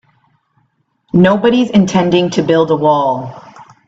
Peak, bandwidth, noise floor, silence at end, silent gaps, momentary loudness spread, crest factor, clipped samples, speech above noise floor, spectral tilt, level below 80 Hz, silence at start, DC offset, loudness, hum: 0 dBFS; 7.8 kHz; -61 dBFS; 0.25 s; none; 7 LU; 14 dB; under 0.1%; 50 dB; -6.5 dB/octave; -50 dBFS; 1.15 s; under 0.1%; -12 LUFS; none